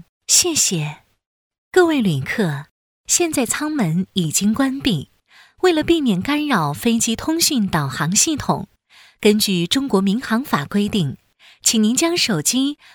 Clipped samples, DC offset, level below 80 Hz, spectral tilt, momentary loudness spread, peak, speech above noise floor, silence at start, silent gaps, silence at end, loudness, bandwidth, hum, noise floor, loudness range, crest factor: under 0.1%; under 0.1%; -50 dBFS; -3.5 dB/octave; 6 LU; 0 dBFS; 33 dB; 0.3 s; 1.27-1.50 s, 1.58-1.71 s, 2.71-3.04 s; 0.2 s; -18 LUFS; 20 kHz; none; -51 dBFS; 2 LU; 18 dB